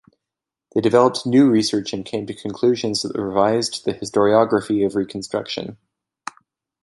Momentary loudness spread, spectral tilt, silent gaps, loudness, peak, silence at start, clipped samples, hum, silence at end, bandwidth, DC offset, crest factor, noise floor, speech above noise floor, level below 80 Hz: 14 LU; -5 dB/octave; none; -19 LUFS; -2 dBFS; 0.75 s; under 0.1%; none; 1.1 s; 11.5 kHz; under 0.1%; 18 dB; -86 dBFS; 67 dB; -58 dBFS